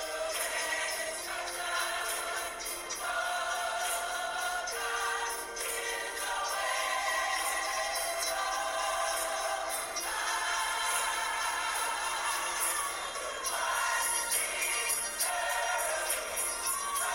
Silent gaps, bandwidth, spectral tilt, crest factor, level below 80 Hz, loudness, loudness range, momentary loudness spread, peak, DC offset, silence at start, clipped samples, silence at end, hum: none; over 20 kHz; 1.5 dB/octave; 16 dB; -62 dBFS; -32 LUFS; 3 LU; 5 LU; -16 dBFS; under 0.1%; 0 s; under 0.1%; 0 s; none